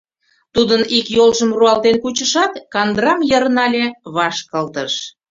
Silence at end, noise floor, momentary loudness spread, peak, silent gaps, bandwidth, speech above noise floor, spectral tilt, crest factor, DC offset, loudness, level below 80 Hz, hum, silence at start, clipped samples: 0.2 s; -62 dBFS; 9 LU; 0 dBFS; none; 7.8 kHz; 46 dB; -3 dB/octave; 16 dB; under 0.1%; -15 LUFS; -52 dBFS; none; 0.55 s; under 0.1%